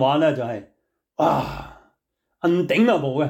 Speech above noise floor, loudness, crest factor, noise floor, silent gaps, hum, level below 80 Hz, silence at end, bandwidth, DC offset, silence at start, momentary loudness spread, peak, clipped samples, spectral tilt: 55 dB; -21 LUFS; 14 dB; -75 dBFS; none; none; -50 dBFS; 0 s; 18.5 kHz; under 0.1%; 0 s; 16 LU; -8 dBFS; under 0.1%; -7 dB/octave